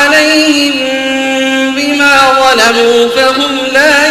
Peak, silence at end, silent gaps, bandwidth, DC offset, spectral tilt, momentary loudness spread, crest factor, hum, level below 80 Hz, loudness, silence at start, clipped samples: 0 dBFS; 0 s; none; 16.5 kHz; under 0.1%; -1.5 dB/octave; 6 LU; 8 dB; none; -44 dBFS; -7 LUFS; 0 s; 0.4%